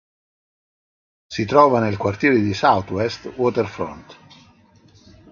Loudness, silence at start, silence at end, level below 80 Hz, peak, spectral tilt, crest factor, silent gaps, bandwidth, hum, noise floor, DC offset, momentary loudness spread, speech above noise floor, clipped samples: -19 LUFS; 1.3 s; 1.2 s; -50 dBFS; 0 dBFS; -6.5 dB/octave; 20 dB; none; 7.4 kHz; none; -52 dBFS; under 0.1%; 13 LU; 34 dB; under 0.1%